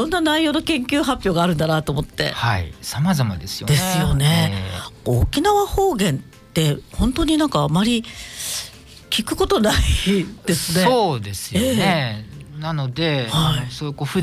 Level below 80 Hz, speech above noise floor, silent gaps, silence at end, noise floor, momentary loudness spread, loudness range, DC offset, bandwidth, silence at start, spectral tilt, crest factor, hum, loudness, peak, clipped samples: -32 dBFS; 20 dB; none; 0 s; -39 dBFS; 9 LU; 2 LU; under 0.1%; 15.5 kHz; 0 s; -5 dB/octave; 14 dB; none; -20 LUFS; -6 dBFS; under 0.1%